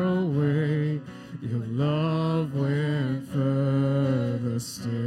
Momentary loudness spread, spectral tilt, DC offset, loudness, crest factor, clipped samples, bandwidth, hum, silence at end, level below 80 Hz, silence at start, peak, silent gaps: 7 LU; -7.5 dB/octave; under 0.1%; -26 LUFS; 12 dB; under 0.1%; 13.5 kHz; none; 0 s; -64 dBFS; 0 s; -14 dBFS; none